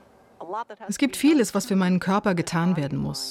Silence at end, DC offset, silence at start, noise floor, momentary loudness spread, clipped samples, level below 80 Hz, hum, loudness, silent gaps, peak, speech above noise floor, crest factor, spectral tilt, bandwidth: 0 s; under 0.1%; 0.4 s; -44 dBFS; 13 LU; under 0.1%; -56 dBFS; none; -24 LUFS; none; -10 dBFS; 21 dB; 14 dB; -5.5 dB/octave; 16 kHz